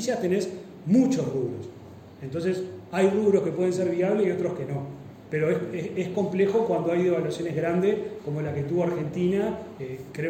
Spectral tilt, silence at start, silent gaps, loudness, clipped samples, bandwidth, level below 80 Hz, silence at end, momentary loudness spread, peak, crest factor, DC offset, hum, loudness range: -7 dB/octave; 0 s; none; -26 LUFS; under 0.1%; 15.5 kHz; -62 dBFS; 0 s; 13 LU; -10 dBFS; 16 dB; under 0.1%; none; 1 LU